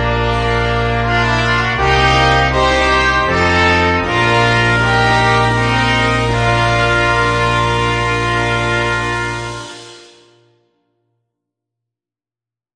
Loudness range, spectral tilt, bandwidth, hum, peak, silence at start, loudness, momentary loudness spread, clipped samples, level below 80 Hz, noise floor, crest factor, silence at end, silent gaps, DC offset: 9 LU; -5 dB/octave; 10 kHz; none; 0 dBFS; 0 s; -13 LUFS; 5 LU; under 0.1%; -28 dBFS; -90 dBFS; 14 dB; 2.75 s; none; under 0.1%